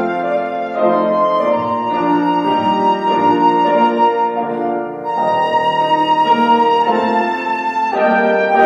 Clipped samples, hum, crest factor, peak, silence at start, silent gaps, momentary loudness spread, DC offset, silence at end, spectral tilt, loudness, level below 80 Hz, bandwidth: under 0.1%; none; 14 dB; -2 dBFS; 0 s; none; 6 LU; under 0.1%; 0 s; -6.5 dB/octave; -15 LUFS; -62 dBFS; 7.6 kHz